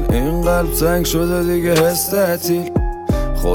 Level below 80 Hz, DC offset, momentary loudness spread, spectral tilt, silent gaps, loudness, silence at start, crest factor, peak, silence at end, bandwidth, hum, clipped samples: -24 dBFS; under 0.1%; 6 LU; -5 dB/octave; none; -17 LUFS; 0 s; 16 dB; 0 dBFS; 0 s; 18.5 kHz; none; under 0.1%